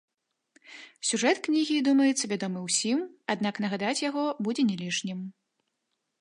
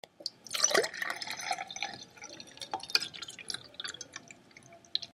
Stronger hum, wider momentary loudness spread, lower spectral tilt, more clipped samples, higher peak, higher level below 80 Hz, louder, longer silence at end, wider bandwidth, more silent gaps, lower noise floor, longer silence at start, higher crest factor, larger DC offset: neither; second, 10 LU vs 19 LU; first, -3.5 dB/octave vs 0.5 dB/octave; neither; about the same, -10 dBFS vs -8 dBFS; about the same, -80 dBFS vs -78 dBFS; first, -27 LUFS vs -34 LUFS; first, 0.9 s vs 0 s; second, 11.5 kHz vs 15.5 kHz; neither; first, -81 dBFS vs -56 dBFS; first, 0.7 s vs 0.2 s; second, 18 dB vs 28 dB; neither